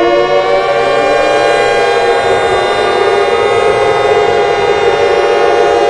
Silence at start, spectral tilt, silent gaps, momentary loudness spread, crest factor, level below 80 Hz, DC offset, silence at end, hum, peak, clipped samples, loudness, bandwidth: 0 s; -4 dB/octave; none; 1 LU; 10 dB; -40 dBFS; 0.1%; 0 s; none; 0 dBFS; under 0.1%; -10 LUFS; 11 kHz